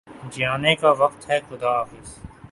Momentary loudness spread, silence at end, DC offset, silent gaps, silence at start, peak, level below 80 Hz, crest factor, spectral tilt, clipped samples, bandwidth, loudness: 22 LU; 0.05 s; under 0.1%; none; 0.1 s; -2 dBFS; -52 dBFS; 20 dB; -4.5 dB/octave; under 0.1%; 11.5 kHz; -21 LUFS